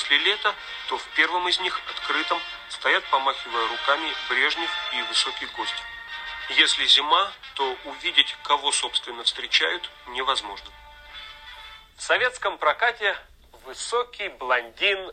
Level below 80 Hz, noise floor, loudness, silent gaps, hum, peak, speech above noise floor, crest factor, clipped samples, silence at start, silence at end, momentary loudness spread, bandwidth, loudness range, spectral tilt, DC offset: -58 dBFS; -44 dBFS; -23 LUFS; none; none; -2 dBFS; 20 dB; 24 dB; under 0.1%; 0 s; 0 s; 15 LU; 15 kHz; 5 LU; 0.5 dB/octave; under 0.1%